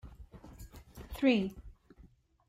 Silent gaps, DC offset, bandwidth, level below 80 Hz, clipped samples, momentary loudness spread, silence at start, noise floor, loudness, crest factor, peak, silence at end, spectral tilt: none; under 0.1%; 15.5 kHz; -54 dBFS; under 0.1%; 25 LU; 0.05 s; -61 dBFS; -31 LUFS; 22 dB; -16 dBFS; 0.75 s; -6.5 dB/octave